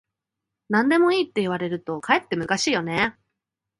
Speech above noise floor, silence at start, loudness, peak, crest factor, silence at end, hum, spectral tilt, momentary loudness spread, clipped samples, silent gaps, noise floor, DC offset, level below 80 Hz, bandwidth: 63 dB; 0.7 s; -22 LUFS; -4 dBFS; 20 dB; 0.7 s; none; -4.5 dB/octave; 8 LU; under 0.1%; none; -85 dBFS; under 0.1%; -62 dBFS; 11.5 kHz